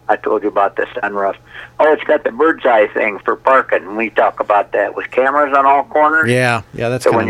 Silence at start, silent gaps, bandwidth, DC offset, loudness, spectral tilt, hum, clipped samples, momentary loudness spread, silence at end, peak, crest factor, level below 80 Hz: 0.1 s; none; 14 kHz; under 0.1%; -14 LUFS; -6 dB/octave; none; under 0.1%; 7 LU; 0 s; 0 dBFS; 14 dB; -54 dBFS